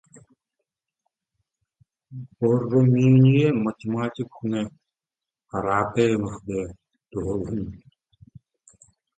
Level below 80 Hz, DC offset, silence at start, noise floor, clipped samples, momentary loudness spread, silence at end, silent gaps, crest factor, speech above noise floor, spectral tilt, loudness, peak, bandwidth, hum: -52 dBFS; under 0.1%; 2.1 s; -90 dBFS; under 0.1%; 19 LU; 1.4 s; none; 18 dB; 68 dB; -8.5 dB/octave; -23 LUFS; -6 dBFS; 8.8 kHz; none